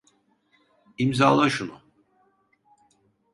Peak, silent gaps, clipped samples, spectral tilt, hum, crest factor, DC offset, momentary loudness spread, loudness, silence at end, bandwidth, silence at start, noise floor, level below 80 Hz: -4 dBFS; none; under 0.1%; -5.5 dB/octave; none; 22 dB; under 0.1%; 13 LU; -22 LUFS; 1.6 s; 11.5 kHz; 1 s; -66 dBFS; -64 dBFS